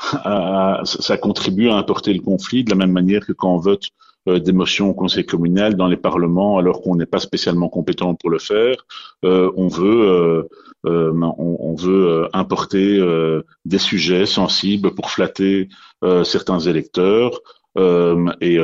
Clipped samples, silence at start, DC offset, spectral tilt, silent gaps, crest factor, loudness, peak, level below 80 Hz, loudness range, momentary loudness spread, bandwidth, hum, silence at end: under 0.1%; 0 s; under 0.1%; -6 dB/octave; none; 16 dB; -17 LUFS; 0 dBFS; -50 dBFS; 1 LU; 6 LU; 7.6 kHz; none; 0 s